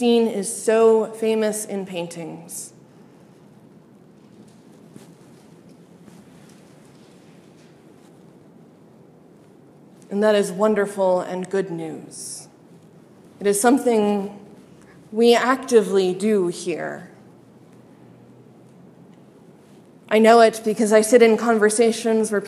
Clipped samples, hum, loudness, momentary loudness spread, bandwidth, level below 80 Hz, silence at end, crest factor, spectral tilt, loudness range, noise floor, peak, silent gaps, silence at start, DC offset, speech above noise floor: under 0.1%; none; -19 LUFS; 18 LU; 14 kHz; -74 dBFS; 0 s; 22 dB; -4.5 dB/octave; 16 LU; -49 dBFS; 0 dBFS; none; 0 s; under 0.1%; 31 dB